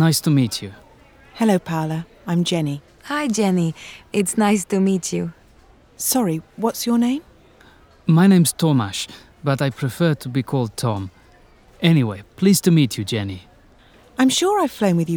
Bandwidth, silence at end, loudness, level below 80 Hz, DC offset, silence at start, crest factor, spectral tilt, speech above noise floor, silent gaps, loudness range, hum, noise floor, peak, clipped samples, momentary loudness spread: over 20 kHz; 0 s; -20 LUFS; -56 dBFS; under 0.1%; 0 s; 18 dB; -5.5 dB/octave; 32 dB; none; 3 LU; none; -50 dBFS; -2 dBFS; under 0.1%; 12 LU